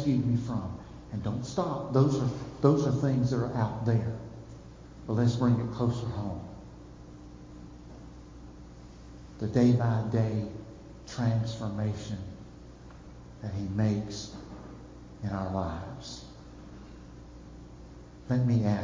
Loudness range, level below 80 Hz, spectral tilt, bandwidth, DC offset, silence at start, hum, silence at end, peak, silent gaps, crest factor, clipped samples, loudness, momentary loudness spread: 11 LU; -50 dBFS; -8 dB/octave; 7.6 kHz; under 0.1%; 0 s; none; 0 s; -8 dBFS; none; 22 dB; under 0.1%; -30 LUFS; 23 LU